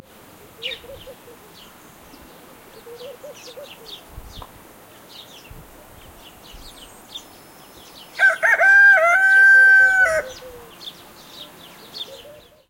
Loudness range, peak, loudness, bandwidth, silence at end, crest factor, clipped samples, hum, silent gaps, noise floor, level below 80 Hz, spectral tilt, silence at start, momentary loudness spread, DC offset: 24 LU; -6 dBFS; -12 LUFS; 16.5 kHz; 0.55 s; 16 dB; under 0.1%; none; none; -46 dBFS; -52 dBFS; -1.5 dB/octave; 0.65 s; 29 LU; under 0.1%